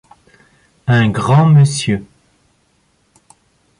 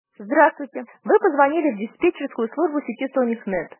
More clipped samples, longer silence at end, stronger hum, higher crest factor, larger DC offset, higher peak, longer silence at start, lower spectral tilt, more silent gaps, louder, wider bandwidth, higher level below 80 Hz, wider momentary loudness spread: neither; first, 1.75 s vs 0.15 s; neither; second, 14 dB vs 20 dB; neither; about the same, -2 dBFS vs -2 dBFS; first, 0.85 s vs 0.2 s; second, -6.5 dB/octave vs -9.5 dB/octave; neither; first, -13 LUFS vs -21 LUFS; first, 11 kHz vs 3.2 kHz; first, -46 dBFS vs -62 dBFS; first, 12 LU vs 9 LU